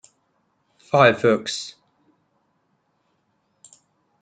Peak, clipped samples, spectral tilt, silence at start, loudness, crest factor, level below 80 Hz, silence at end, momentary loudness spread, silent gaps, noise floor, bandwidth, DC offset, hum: -2 dBFS; under 0.1%; -4.5 dB/octave; 0.95 s; -19 LUFS; 24 dB; -68 dBFS; 2.5 s; 15 LU; none; -69 dBFS; 9.4 kHz; under 0.1%; none